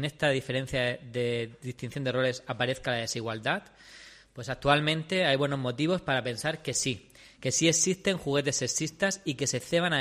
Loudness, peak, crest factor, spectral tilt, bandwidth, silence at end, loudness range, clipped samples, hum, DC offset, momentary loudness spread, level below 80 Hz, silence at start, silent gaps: -29 LUFS; -8 dBFS; 22 dB; -3.5 dB/octave; 15 kHz; 0 s; 4 LU; under 0.1%; none; under 0.1%; 12 LU; -58 dBFS; 0 s; none